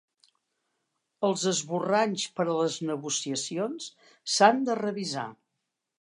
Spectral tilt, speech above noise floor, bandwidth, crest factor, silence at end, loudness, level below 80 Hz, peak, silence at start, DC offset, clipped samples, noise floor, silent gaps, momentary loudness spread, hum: -3.5 dB/octave; 56 dB; 11.5 kHz; 24 dB; 0.65 s; -27 LUFS; -82 dBFS; -4 dBFS; 1.2 s; under 0.1%; under 0.1%; -83 dBFS; none; 13 LU; none